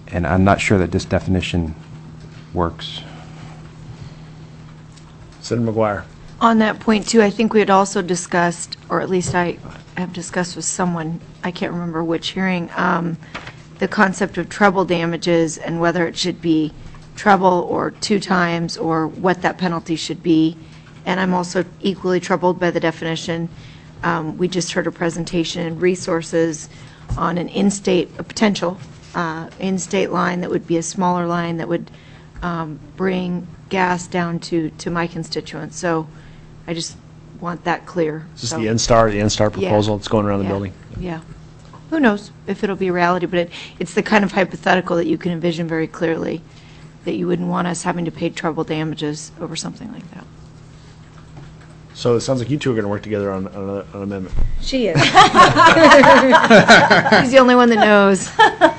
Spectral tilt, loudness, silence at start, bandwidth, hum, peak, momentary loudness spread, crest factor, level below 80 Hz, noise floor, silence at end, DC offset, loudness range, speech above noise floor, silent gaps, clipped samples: -5 dB/octave; -17 LUFS; 0.05 s; 9.8 kHz; none; 0 dBFS; 17 LU; 18 dB; -38 dBFS; -41 dBFS; 0 s; under 0.1%; 12 LU; 24 dB; none; under 0.1%